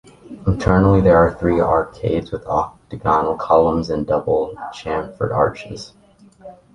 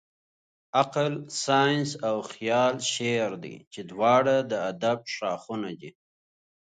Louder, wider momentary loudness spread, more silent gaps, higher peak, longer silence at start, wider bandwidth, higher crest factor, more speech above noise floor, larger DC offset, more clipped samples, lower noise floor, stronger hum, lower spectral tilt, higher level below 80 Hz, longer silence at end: first, -18 LUFS vs -26 LUFS; about the same, 14 LU vs 14 LU; second, none vs 3.67-3.71 s; first, -2 dBFS vs -6 dBFS; second, 0.25 s vs 0.75 s; first, 10.5 kHz vs 9.4 kHz; about the same, 16 dB vs 20 dB; second, 25 dB vs over 64 dB; neither; neither; second, -43 dBFS vs under -90 dBFS; neither; first, -8 dB/octave vs -4 dB/octave; first, -36 dBFS vs -74 dBFS; second, 0.2 s vs 0.85 s